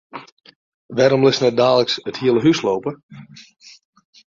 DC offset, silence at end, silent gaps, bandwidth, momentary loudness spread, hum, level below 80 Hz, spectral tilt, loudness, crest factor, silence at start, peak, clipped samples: under 0.1%; 0.95 s; 0.32-0.37 s, 0.56-0.89 s, 3.03-3.09 s; 7.6 kHz; 19 LU; none; -60 dBFS; -5.5 dB/octave; -17 LUFS; 18 dB; 0.15 s; -2 dBFS; under 0.1%